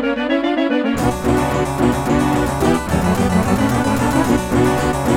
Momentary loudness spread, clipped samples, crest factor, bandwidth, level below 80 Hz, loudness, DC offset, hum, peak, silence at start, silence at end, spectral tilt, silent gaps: 2 LU; under 0.1%; 14 dB; 17.5 kHz; -32 dBFS; -17 LUFS; under 0.1%; none; -2 dBFS; 0 s; 0 s; -6 dB/octave; none